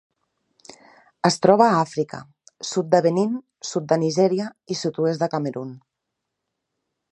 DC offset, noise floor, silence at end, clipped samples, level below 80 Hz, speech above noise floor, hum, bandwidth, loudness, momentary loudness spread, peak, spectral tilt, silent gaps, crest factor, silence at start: under 0.1%; -81 dBFS; 1.35 s; under 0.1%; -70 dBFS; 60 dB; none; 11 kHz; -21 LUFS; 14 LU; 0 dBFS; -5.5 dB/octave; none; 22 dB; 1.25 s